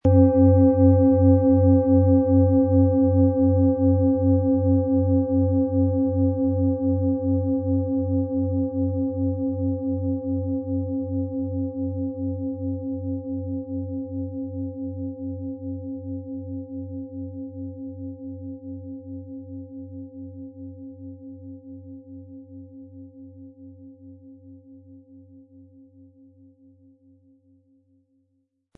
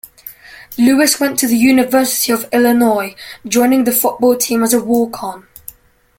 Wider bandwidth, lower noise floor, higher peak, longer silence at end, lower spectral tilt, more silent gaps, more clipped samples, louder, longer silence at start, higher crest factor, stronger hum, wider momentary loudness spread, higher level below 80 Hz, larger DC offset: second, 1.7 kHz vs 17 kHz; first, -72 dBFS vs -39 dBFS; second, -6 dBFS vs 0 dBFS; first, 3.6 s vs 0.8 s; first, -14.5 dB/octave vs -3 dB/octave; neither; neither; second, -22 LUFS vs -13 LUFS; second, 0.05 s vs 0.25 s; about the same, 18 dB vs 14 dB; neither; first, 23 LU vs 20 LU; second, -60 dBFS vs -52 dBFS; neither